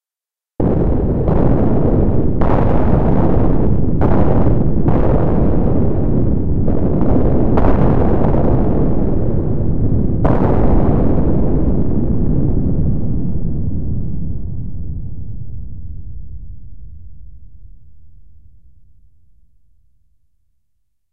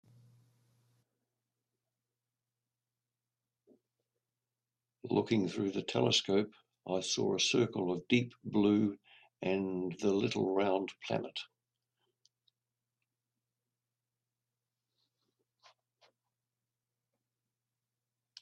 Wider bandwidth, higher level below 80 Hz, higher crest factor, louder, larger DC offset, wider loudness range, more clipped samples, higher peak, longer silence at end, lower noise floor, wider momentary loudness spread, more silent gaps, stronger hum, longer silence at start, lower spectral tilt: second, 4 kHz vs 10.5 kHz; first, -20 dBFS vs -76 dBFS; second, 12 dB vs 22 dB; first, -16 LUFS vs -33 LUFS; first, 20% vs under 0.1%; first, 14 LU vs 9 LU; neither; first, 0 dBFS vs -14 dBFS; second, 0 s vs 6.95 s; about the same, -90 dBFS vs under -90 dBFS; about the same, 13 LU vs 12 LU; neither; neither; second, 0 s vs 5.05 s; first, -12 dB/octave vs -4.5 dB/octave